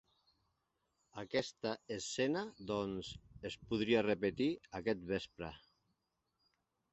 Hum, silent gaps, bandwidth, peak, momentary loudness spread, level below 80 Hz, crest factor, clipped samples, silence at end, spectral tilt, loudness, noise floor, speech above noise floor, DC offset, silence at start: none; none; 8 kHz; -20 dBFS; 15 LU; -66 dBFS; 20 dB; under 0.1%; 1.35 s; -4 dB/octave; -39 LUFS; -85 dBFS; 46 dB; under 0.1%; 1.15 s